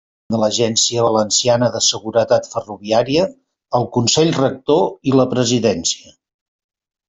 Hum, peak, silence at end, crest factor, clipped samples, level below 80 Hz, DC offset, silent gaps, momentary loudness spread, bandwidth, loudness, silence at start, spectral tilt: none; -2 dBFS; 1.1 s; 16 dB; under 0.1%; -54 dBFS; under 0.1%; none; 7 LU; 8.4 kHz; -16 LUFS; 0.3 s; -4 dB/octave